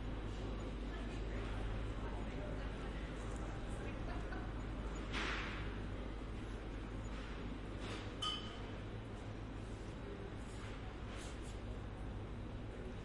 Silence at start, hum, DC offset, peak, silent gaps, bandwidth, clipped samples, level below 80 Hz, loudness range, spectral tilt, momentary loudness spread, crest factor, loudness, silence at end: 0 s; none; under 0.1%; -28 dBFS; none; 11.5 kHz; under 0.1%; -48 dBFS; 4 LU; -5.5 dB/octave; 7 LU; 16 dB; -46 LUFS; 0 s